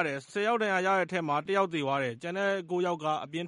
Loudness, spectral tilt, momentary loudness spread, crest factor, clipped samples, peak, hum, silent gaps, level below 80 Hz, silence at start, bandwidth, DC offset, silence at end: -30 LUFS; -5.5 dB/octave; 5 LU; 16 dB; under 0.1%; -12 dBFS; none; none; -76 dBFS; 0 s; 11.5 kHz; under 0.1%; 0 s